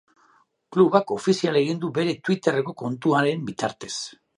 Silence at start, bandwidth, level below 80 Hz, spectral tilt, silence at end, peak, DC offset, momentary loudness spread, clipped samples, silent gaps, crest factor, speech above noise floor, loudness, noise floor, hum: 0.7 s; 11.5 kHz; -70 dBFS; -5.5 dB/octave; 0.25 s; -2 dBFS; under 0.1%; 11 LU; under 0.1%; none; 20 dB; 39 dB; -23 LUFS; -61 dBFS; none